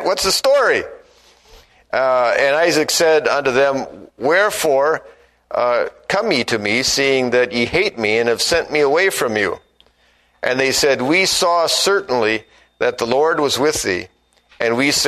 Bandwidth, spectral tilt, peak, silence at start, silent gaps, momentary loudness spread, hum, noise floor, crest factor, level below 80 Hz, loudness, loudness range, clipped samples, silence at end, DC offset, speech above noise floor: 13.5 kHz; -2.5 dB/octave; 0 dBFS; 0 s; none; 8 LU; none; -57 dBFS; 16 dB; -50 dBFS; -16 LUFS; 2 LU; under 0.1%; 0 s; under 0.1%; 41 dB